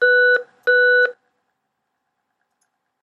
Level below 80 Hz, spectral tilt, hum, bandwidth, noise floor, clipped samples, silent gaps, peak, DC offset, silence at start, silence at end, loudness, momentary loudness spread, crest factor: -90 dBFS; -1 dB/octave; none; 4.5 kHz; -75 dBFS; under 0.1%; none; -6 dBFS; under 0.1%; 0 s; 1.9 s; -16 LUFS; 6 LU; 14 dB